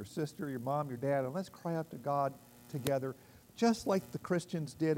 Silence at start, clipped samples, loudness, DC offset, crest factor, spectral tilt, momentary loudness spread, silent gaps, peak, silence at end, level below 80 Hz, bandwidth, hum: 0 s; under 0.1%; -36 LUFS; under 0.1%; 20 dB; -6.5 dB/octave; 10 LU; none; -16 dBFS; 0 s; -70 dBFS; 16 kHz; none